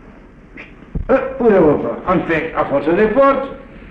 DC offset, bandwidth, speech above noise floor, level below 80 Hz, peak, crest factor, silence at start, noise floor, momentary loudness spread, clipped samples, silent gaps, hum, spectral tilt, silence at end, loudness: under 0.1%; 5.6 kHz; 26 dB; -36 dBFS; -2 dBFS; 14 dB; 0.05 s; -40 dBFS; 17 LU; under 0.1%; none; none; -9 dB/octave; 0 s; -15 LUFS